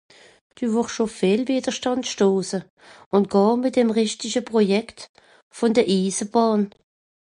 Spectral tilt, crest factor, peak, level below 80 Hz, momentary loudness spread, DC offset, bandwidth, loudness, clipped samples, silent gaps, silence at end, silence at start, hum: -5 dB/octave; 16 dB; -6 dBFS; -62 dBFS; 8 LU; under 0.1%; 11.5 kHz; -21 LUFS; under 0.1%; 2.70-2.77 s, 3.06-3.11 s, 5.09-5.14 s, 5.42-5.51 s; 0.7 s; 0.6 s; none